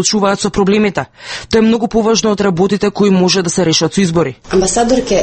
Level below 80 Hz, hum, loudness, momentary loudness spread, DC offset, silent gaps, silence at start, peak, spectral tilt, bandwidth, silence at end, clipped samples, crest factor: -36 dBFS; none; -12 LUFS; 4 LU; under 0.1%; none; 0 s; 0 dBFS; -4.5 dB/octave; 9 kHz; 0 s; under 0.1%; 12 dB